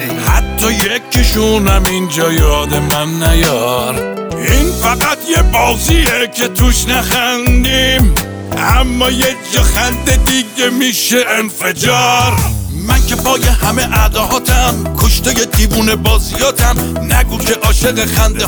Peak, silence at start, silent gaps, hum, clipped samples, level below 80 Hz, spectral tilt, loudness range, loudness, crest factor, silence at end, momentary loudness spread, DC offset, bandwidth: 0 dBFS; 0 s; none; none; under 0.1%; -16 dBFS; -3.5 dB/octave; 1 LU; -12 LUFS; 12 dB; 0 s; 3 LU; under 0.1%; over 20 kHz